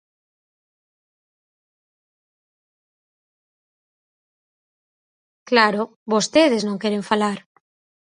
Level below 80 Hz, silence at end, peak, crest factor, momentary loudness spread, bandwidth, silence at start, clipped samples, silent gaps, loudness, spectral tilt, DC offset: -70 dBFS; 0.7 s; 0 dBFS; 26 dB; 8 LU; 10.5 kHz; 5.5 s; under 0.1%; 5.96-6.06 s; -19 LUFS; -4 dB/octave; under 0.1%